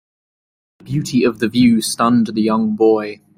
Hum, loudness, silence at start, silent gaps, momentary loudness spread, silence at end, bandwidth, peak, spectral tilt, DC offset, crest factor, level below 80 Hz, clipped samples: none; -16 LUFS; 0.85 s; none; 6 LU; 0.25 s; 16 kHz; -2 dBFS; -5.5 dB/octave; under 0.1%; 14 dB; -52 dBFS; under 0.1%